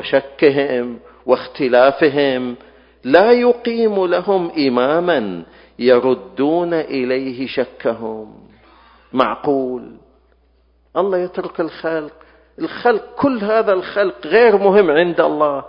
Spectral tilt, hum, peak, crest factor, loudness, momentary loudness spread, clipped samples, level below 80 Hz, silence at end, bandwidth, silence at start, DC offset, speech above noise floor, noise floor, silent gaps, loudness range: -8.5 dB/octave; none; 0 dBFS; 16 dB; -16 LUFS; 14 LU; under 0.1%; -56 dBFS; 0 s; 5.4 kHz; 0 s; under 0.1%; 40 dB; -56 dBFS; none; 8 LU